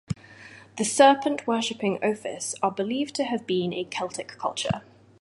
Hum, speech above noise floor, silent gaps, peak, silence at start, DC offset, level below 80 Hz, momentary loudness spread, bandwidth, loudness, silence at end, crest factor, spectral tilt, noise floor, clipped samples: none; 23 dB; none; -4 dBFS; 0.1 s; under 0.1%; -58 dBFS; 16 LU; 11.5 kHz; -26 LUFS; 0.4 s; 22 dB; -4 dB/octave; -48 dBFS; under 0.1%